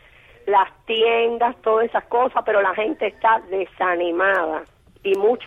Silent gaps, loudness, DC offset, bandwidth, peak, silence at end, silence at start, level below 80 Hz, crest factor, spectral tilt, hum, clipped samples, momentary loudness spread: none; -20 LUFS; under 0.1%; 7 kHz; -6 dBFS; 0 s; 0.45 s; -58 dBFS; 14 dB; -5 dB/octave; none; under 0.1%; 6 LU